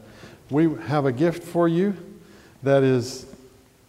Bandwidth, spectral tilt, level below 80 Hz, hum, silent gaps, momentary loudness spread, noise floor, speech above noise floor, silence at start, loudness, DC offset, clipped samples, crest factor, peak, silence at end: 15 kHz; -7 dB/octave; -60 dBFS; none; none; 12 LU; -52 dBFS; 30 dB; 0.25 s; -22 LUFS; under 0.1%; under 0.1%; 16 dB; -8 dBFS; 0.55 s